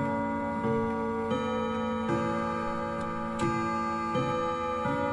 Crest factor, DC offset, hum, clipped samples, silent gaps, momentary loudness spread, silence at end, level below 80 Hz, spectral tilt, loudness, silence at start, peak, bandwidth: 14 dB; under 0.1%; none; under 0.1%; none; 3 LU; 0 s; -56 dBFS; -6.5 dB/octave; -30 LUFS; 0 s; -16 dBFS; 11.5 kHz